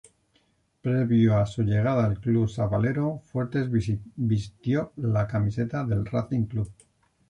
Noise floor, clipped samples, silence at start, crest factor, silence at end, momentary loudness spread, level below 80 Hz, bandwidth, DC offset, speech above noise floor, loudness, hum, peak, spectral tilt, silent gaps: -67 dBFS; under 0.1%; 0.85 s; 14 dB; 0.6 s; 7 LU; -48 dBFS; 9.6 kHz; under 0.1%; 43 dB; -26 LUFS; none; -10 dBFS; -9 dB/octave; none